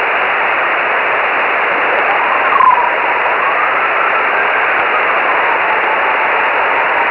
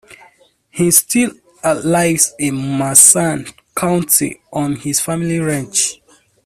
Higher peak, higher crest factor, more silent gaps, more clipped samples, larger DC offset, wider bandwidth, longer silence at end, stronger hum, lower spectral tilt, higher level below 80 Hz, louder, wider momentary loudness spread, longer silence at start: about the same, -2 dBFS vs 0 dBFS; about the same, 12 dB vs 16 dB; neither; second, under 0.1% vs 0.2%; neither; second, 5.4 kHz vs over 20 kHz; second, 0 s vs 0.5 s; neither; first, -5 dB/octave vs -3.5 dB/octave; about the same, -54 dBFS vs -52 dBFS; about the same, -12 LUFS vs -13 LUFS; second, 2 LU vs 14 LU; about the same, 0 s vs 0.1 s